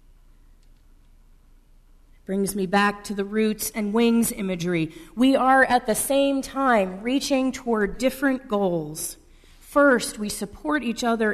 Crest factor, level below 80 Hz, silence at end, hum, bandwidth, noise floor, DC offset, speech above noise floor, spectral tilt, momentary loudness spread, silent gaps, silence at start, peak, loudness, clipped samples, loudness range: 18 dB; -50 dBFS; 0 s; none; 13.5 kHz; -53 dBFS; under 0.1%; 31 dB; -4.5 dB/octave; 10 LU; none; 2.3 s; -6 dBFS; -23 LUFS; under 0.1%; 6 LU